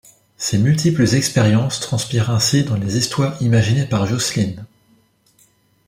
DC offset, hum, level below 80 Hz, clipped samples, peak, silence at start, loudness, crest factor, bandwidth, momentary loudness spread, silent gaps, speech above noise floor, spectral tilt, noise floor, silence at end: under 0.1%; none; -50 dBFS; under 0.1%; -2 dBFS; 0.4 s; -17 LUFS; 16 dB; 16 kHz; 6 LU; none; 40 dB; -5 dB/octave; -57 dBFS; 1.2 s